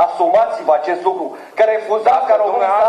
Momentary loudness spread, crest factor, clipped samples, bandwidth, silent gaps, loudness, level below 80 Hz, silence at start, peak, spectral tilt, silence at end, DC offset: 6 LU; 12 dB; under 0.1%; 9.4 kHz; none; -15 LUFS; -64 dBFS; 0 s; -2 dBFS; -4.5 dB/octave; 0 s; under 0.1%